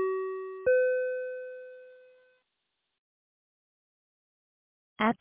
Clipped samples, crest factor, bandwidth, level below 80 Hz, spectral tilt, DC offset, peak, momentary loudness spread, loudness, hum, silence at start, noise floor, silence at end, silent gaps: under 0.1%; 20 dB; 3.8 kHz; -72 dBFS; -3.5 dB/octave; under 0.1%; -14 dBFS; 20 LU; -30 LUFS; none; 0 s; -82 dBFS; 0.05 s; 2.98-4.96 s